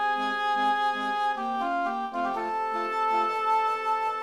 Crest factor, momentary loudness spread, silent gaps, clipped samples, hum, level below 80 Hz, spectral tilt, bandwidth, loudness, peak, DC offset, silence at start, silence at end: 12 dB; 4 LU; none; under 0.1%; none; -72 dBFS; -3 dB/octave; 12.5 kHz; -27 LUFS; -16 dBFS; 0.1%; 0 s; 0 s